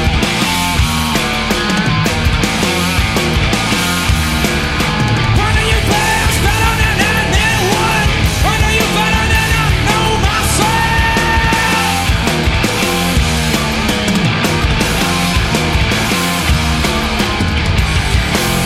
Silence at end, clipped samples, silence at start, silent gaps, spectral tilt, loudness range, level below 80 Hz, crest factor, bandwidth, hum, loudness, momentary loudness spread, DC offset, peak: 0 s; under 0.1%; 0 s; none; -4 dB/octave; 1 LU; -20 dBFS; 12 dB; 16.5 kHz; none; -13 LUFS; 2 LU; under 0.1%; -2 dBFS